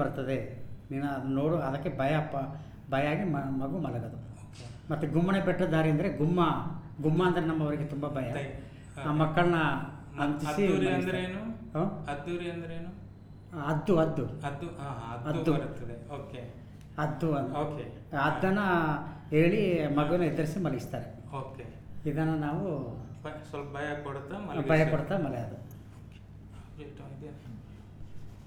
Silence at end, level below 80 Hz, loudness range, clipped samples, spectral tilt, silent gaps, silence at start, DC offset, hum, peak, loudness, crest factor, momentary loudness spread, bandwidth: 0 s; -52 dBFS; 6 LU; under 0.1%; -7.5 dB/octave; none; 0 s; under 0.1%; none; -12 dBFS; -31 LUFS; 18 dB; 19 LU; 15 kHz